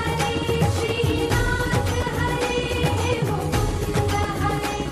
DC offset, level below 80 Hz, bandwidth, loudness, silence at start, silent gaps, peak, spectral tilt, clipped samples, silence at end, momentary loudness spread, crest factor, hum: under 0.1%; -32 dBFS; 15 kHz; -23 LUFS; 0 s; none; -8 dBFS; -5 dB/octave; under 0.1%; 0 s; 2 LU; 14 dB; none